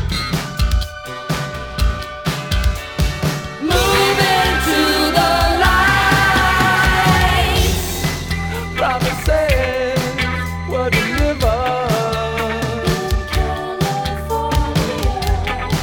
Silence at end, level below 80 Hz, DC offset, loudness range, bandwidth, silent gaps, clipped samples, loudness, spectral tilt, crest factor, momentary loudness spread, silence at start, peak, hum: 0 s; -24 dBFS; under 0.1%; 6 LU; over 20 kHz; none; under 0.1%; -17 LUFS; -4.5 dB/octave; 16 dB; 9 LU; 0 s; 0 dBFS; none